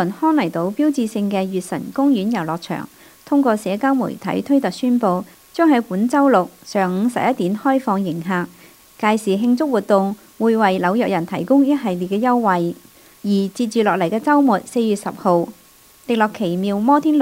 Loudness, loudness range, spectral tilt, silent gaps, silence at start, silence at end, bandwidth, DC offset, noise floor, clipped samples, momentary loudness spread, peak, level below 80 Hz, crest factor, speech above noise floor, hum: -18 LUFS; 2 LU; -6.5 dB/octave; none; 0 s; 0 s; 16 kHz; under 0.1%; -46 dBFS; under 0.1%; 8 LU; -2 dBFS; -64 dBFS; 16 dB; 29 dB; none